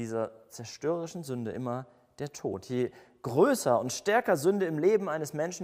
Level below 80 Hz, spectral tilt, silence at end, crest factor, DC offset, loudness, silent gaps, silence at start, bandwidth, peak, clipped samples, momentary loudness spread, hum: -72 dBFS; -5 dB/octave; 0 s; 18 dB; under 0.1%; -30 LUFS; none; 0 s; 16 kHz; -12 dBFS; under 0.1%; 14 LU; none